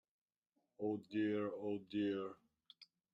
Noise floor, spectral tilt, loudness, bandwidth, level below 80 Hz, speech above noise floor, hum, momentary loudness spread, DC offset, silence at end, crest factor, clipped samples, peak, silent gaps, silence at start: -87 dBFS; -8 dB/octave; -42 LUFS; 5.6 kHz; -86 dBFS; 46 dB; none; 23 LU; under 0.1%; 0.3 s; 16 dB; under 0.1%; -28 dBFS; none; 0.8 s